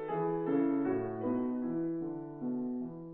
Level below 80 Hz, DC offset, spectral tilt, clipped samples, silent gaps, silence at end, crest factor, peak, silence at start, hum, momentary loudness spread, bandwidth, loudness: -66 dBFS; under 0.1%; -9 dB/octave; under 0.1%; none; 0 s; 14 dB; -20 dBFS; 0 s; none; 8 LU; 3.8 kHz; -35 LUFS